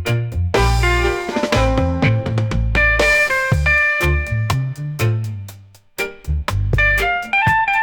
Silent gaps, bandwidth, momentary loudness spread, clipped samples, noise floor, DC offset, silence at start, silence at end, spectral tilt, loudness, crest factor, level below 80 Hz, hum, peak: none; 19.5 kHz; 11 LU; under 0.1%; -41 dBFS; under 0.1%; 0 s; 0 s; -5.5 dB/octave; -17 LUFS; 12 dB; -24 dBFS; none; -4 dBFS